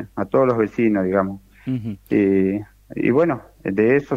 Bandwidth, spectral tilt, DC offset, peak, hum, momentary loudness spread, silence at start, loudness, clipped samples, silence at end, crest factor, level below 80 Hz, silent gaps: 12.5 kHz; -9.5 dB/octave; under 0.1%; -4 dBFS; none; 10 LU; 0 s; -20 LUFS; under 0.1%; 0 s; 14 dB; -52 dBFS; none